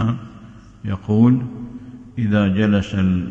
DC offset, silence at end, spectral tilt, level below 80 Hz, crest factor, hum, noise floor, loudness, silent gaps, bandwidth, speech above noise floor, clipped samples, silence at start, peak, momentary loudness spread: under 0.1%; 0 s; -8.5 dB/octave; -46 dBFS; 16 dB; none; -41 dBFS; -18 LUFS; none; 7.6 kHz; 24 dB; under 0.1%; 0 s; -4 dBFS; 19 LU